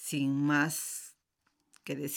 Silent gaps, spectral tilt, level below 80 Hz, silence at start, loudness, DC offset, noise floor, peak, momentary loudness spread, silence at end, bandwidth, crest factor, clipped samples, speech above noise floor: none; -4 dB/octave; -82 dBFS; 0 s; -32 LUFS; under 0.1%; -78 dBFS; -16 dBFS; 19 LU; 0 s; 19 kHz; 18 dB; under 0.1%; 47 dB